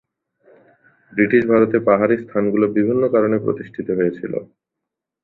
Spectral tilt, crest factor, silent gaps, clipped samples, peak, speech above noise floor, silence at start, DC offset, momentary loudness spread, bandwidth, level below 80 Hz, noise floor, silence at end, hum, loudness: -10.5 dB/octave; 18 dB; none; under 0.1%; -2 dBFS; 65 dB; 1.15 s; under 0.1%; 12 LU; 4.2 kHz; -58 dBFS; -82 dBFS; 0.8 s; none; -18 LUFS